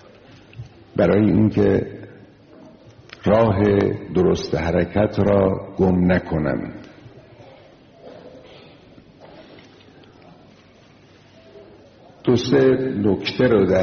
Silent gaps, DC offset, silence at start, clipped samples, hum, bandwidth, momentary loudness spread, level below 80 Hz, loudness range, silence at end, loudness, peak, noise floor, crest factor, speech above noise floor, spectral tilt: none; under 0.1%; 0.55 s; under 0.1%; none; 6.6 kHz; 16 LU; -44 dBFS; 9 LU; 0 s; -19 LUFS; -6 dBFS; -50 dBFS; 16 dB; 32 dB; -6.5 dB/octave